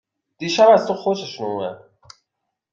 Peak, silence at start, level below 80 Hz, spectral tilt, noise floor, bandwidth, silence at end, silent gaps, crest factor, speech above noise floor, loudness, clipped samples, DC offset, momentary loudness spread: -2 dBFS; 0.4 s; -66 dBFS; -4.5 dB/octave; -79 dBFS; 7.6 kHz; 0.95 s; none; 18 dB; 61 dB; -18 LUFS; under 0.1%; under 0.1%; 16 LU